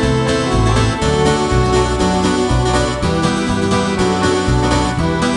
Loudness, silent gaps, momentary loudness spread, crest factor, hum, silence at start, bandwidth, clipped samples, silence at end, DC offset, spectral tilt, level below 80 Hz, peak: -15 LUFS; none; 2 LU; 12 dB; none; 0 s; 12 kHz; under 0.1%; 0 s; under 0.1%; -5.5 dB/octave; -24 dBFS; -2 dBFS